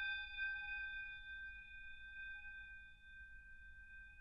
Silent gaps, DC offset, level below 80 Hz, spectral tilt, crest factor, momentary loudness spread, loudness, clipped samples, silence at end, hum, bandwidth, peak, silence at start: none; under 0.1%; -64 dBFS; -2 dB/octave; 16 dB; 15 LU; -49 LUFS; under 0.1%; 0 s; none; 10.5 kHz; -34 dBFS; 0 s